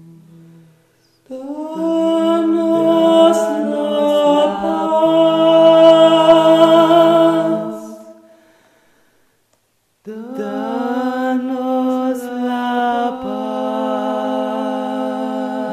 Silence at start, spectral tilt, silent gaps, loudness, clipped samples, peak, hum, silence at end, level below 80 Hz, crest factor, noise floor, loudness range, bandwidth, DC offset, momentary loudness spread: 1.3 s; -5.5 dB/octave; none; -14 LUFS; under 0.1%; 0 dBFS; none; 0 s; -62 dBFS; 16 dB; -63 dBFS; 13 LU; 14 kHz; under 0.1%; 15 LU